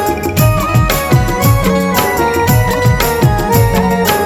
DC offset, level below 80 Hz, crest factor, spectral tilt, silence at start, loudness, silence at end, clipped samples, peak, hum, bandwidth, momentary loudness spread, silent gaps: under 0.1%; -22 dBFS; 12 dB; -5.5 dB/octave; 0 s; -12 LUFS; 0 s; under 0.1%; 0 dBFS; none; 18 kHz; 1 LU; none